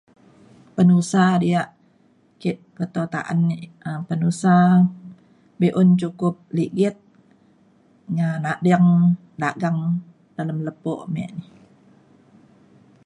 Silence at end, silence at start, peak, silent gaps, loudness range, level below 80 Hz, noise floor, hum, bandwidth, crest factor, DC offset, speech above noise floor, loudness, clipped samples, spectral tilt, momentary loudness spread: 1.65 s; 0.75 s; -6 dBFS; none; 6 LU; -64 dBFS; -58 dBFS; none; 10.5 kHz; 16 dB; under 0.1%; 39 dB; -21 LUFS; under 0.1%; -7.5 dB/octave; 14 LU